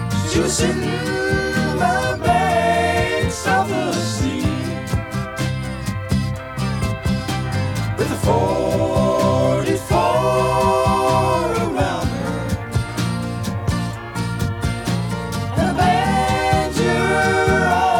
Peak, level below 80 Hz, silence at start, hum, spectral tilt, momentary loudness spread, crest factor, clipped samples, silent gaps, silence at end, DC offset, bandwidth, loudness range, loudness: -4 dBFS; -34 dBFS; 0 s; none; -5.5 dB/octave; 7 LU; 16 dB; under 0.1%; none; 0 s; under 0.1%; 18.5 kHz; 5 LU; -19 LUFS